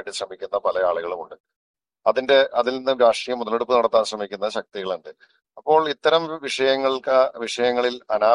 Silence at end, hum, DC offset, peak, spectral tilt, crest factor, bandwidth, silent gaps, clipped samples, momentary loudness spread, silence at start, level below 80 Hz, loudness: 0 s; none; under 0.1%; -4 dBFS; -3 dB/octave; 18 dB; 11 kHz; 1.40-1.44 s, 1.56-1.74 s; under 0.1%; 12 LU; 0 s; -64 dBFS; -21 LUFS